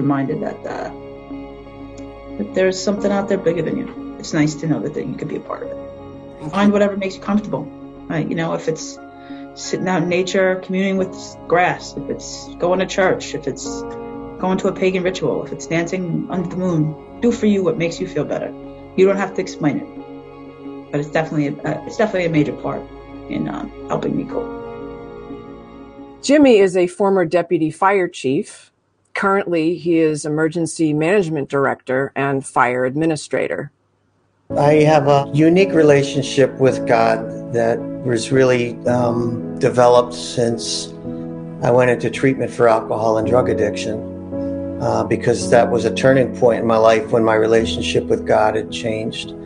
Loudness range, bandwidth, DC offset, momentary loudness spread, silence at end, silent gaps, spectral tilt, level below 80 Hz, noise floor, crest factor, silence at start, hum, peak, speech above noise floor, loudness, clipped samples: 7 LU; 10.5 kHz; under 0.1%; 18 LU; 0 s; none; -6 dB/octave; -48 dBFS; -62 dBFS; 18 dB; 0 s; none; 0 dBFS; 45 dB; -18 LUFS; under 0.1%